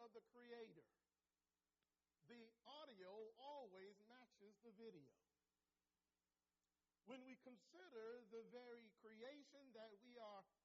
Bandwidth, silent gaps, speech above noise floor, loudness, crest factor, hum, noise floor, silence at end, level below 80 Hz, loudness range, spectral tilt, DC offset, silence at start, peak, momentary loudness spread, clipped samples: 7.2 kHz; none; over 28 dB; -63 LUFS; 16 dB; none; under -90 dBFS; 0.15 s; under -90 dBFS; 6 LU; -2.5 dB/octave; under 0.1%; 0 s; -48 dBFS; 8 LU; under 0.1%